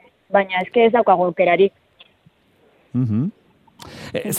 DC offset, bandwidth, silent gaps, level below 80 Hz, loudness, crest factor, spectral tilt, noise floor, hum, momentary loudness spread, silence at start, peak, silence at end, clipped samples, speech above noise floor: under 0.1%; 15 kHz; none; -62 dBFS; -18 LUFS; 18 dB; -5.5 dB/octave; -57 dBFS; none; 13 LU; 0.3 s; -2 dBFS; 0 s; under 0.1%; 40 dB